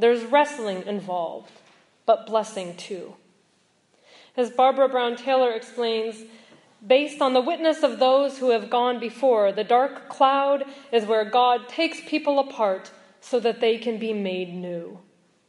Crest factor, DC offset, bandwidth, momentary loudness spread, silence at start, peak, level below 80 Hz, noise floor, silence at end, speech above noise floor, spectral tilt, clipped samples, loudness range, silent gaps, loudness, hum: 18 dB; under 0.1%; 11.5 kHz; 13 LU; 0 s; -4 dBFS; -84 dBFS; -65 dBFS; 0.5 s; 42 dB; -4.5 dB/octave; under 0.1%; 6 LU; none; -23 LUFS; none